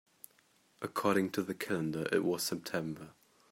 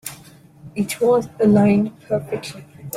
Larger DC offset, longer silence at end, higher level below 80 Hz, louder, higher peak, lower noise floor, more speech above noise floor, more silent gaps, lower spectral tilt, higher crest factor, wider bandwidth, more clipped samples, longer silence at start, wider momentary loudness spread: neither; first, 0.4 s vs 0 s; second, -76 dBFS vs -56 dBFS; second, -35 LUFS vs -19 LUFS; second, -16 dBFS vs -4 dBFS; first, -69 dBFS vs -45 dBFS; first, 35 dB vs 27 dB; neither; second, -4.5 dB/octave vs -6.5 dB/octave; about the same, 20 dB vs 16 dB; about the same, 16 kHz vs 16 kHz; neither; first, 0.8 s vs 0.05 s; first, 23 LU vs 19 LU